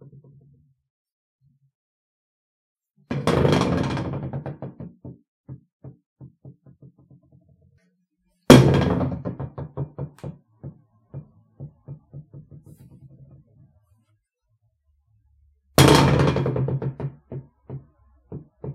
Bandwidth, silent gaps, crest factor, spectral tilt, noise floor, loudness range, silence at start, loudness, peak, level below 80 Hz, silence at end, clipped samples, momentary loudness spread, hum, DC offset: 16 kHz; 5.28-5.44 s, 5.72-5.80 s, 6.06-6.16 s; 26 dB; -6 dB/octave; -71 dBFS; 19 LU; 3.1 s; -20 LUFS; 0 dBFS; -44 dBFS; 0 s; under 0.1%; 29 LU; none; under 0.1%